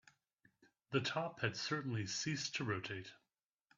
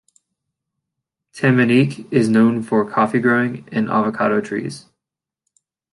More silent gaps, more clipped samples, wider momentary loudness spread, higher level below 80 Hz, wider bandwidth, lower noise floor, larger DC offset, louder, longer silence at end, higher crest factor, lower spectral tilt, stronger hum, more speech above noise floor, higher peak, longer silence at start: neither; neither; second, 7 LU vs 10 LU; second, -78 dBFS vs -62 dBFS; second, 7.8 kHz vs 11.5 kHz; first, -89 dBFS vs -85 dBFS; neither; second, -41 LUFS vs -17 LUFS; second, 0.65 s vs 1.15 s; first, 22 dB vs 16 dB; second, -4 dB/octave vs -7 dB/octave; neither; second, 49 dB vs 69 dB; second, -22 dBFS vs -2 dBFS; second, 0.9 s vs 1.35 s